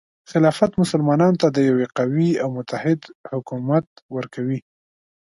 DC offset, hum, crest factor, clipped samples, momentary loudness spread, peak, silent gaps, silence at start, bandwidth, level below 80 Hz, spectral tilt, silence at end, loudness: under 0.1%; none; 18 dB; under 0.1%; 13 LU; -4 dBFS; 3.15-3.24 s, 3.87-3.96 s, 4.02-4.09 s; 0.3 s; 11.5 kHz; -60 dBFS; -7.5 dB/octave; 0.7 s; -21 LUFS